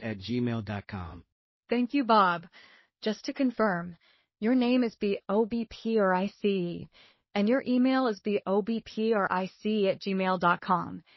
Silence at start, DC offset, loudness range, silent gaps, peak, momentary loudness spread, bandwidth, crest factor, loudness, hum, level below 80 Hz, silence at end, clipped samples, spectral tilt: 0 s; under 0.1%; 2 LU; 1.32-1.61 s; -10 dBFS; 11 LU; 6 kHz; 18 dB; -28 LUFS; none; -64 dBFS; 0.2 s; under 0.1%; -5 dB/octave